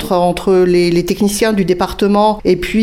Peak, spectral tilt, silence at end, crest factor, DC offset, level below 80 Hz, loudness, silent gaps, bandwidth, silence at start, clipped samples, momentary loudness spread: 0 dBFS; -5.5 dB/octave; 0 s; 12 dB; under 0.1%; -34 dBFS; -13 LUFS; none; 16.5 kHz; 0 s; under 0.1%; 4 LU